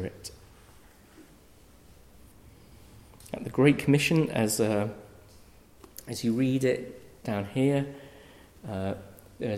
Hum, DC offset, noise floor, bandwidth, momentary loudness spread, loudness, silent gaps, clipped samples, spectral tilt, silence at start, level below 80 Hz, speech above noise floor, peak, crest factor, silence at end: none; under 0.1%; -56 dBFS; 16 kHz; 23 LU; -28 LUFS; none; under 0.1%; -5.5 dB/octave; 0 s; -58 dBFS; 29 dB; -10 dBFS; 20 dB; 0 s